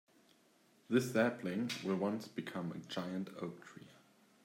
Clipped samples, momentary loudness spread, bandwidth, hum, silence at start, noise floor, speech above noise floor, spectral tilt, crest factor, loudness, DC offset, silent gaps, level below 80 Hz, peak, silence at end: under 0.1%; 13 LU; 16 kHz; none; 0.9 s; -70 dBFS; 32 dB; -5.5 dB/octave; 22 dB; -38 LUFS; under 0.1%; none; -84 dBFS; -18 dBFS; 0.5 s